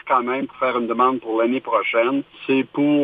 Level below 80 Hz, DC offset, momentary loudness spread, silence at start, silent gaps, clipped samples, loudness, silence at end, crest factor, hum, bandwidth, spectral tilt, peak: -66 dBFS; under 0.1%; 4 LU; 0.05 s; none; under 0.1%; -20 LUFS; 0 s; 16 dB; none; 4.8 kHz; -8 dB/octave; -4 dBFS